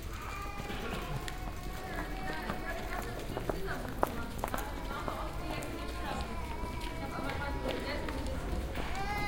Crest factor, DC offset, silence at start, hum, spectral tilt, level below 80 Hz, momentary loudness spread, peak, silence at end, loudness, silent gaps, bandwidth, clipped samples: 28 dB; under 0.1%; 0 s; none; -5 dB/octave; -42 dBFS; 4 LU; -8 dBFS; 0 s; -39 LUFS; none; 17 kHz; under 0.1%